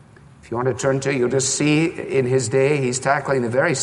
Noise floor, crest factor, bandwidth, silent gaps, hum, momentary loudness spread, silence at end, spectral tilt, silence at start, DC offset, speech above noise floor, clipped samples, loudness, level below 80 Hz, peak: -46 dBFS; 16 dB; 11.5 kHz; none; none; 4 LU; 0 s; -4.5 dB/octave; 0.45 s; under 0.1%; 27 dB; under 0.1%; -20 LUFS; -56 dBFS; -4 dBFS